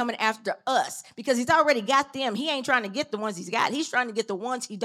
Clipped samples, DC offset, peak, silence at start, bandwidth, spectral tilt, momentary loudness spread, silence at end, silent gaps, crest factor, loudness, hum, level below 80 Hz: under 0.1%; under 0.1%; -6 dBFS; 0 s; 15.5 kHz; -3 dB/octave; 10 LU; 0 s; none; 20 dB; -26 LUFS; none; -72 dBFS